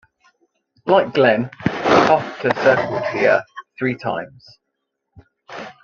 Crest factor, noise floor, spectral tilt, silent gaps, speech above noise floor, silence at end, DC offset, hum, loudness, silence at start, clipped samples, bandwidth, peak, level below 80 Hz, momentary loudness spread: 18 dB; -77 dBFS; -6 dB/octave; none; 58 dB; 0.1 s; under 0.1%; none; -18 LUFS; 0.85 s; under 0.1%; 7.2 kHz; -2 dBFS; -56 dBFS; 20 LU